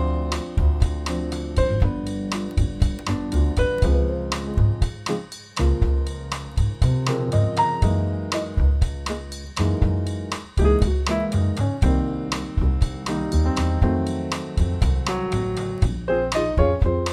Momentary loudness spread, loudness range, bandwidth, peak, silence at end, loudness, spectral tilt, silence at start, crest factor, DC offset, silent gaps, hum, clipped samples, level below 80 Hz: 7 LU; 1 LU; 12 kHz; -4 dBFS; 0 s; -23 LUFS; -6.5 dB/octave; 0 s; 16 dB; under 0.1%; none; none; under 0.1%; -24 dBFS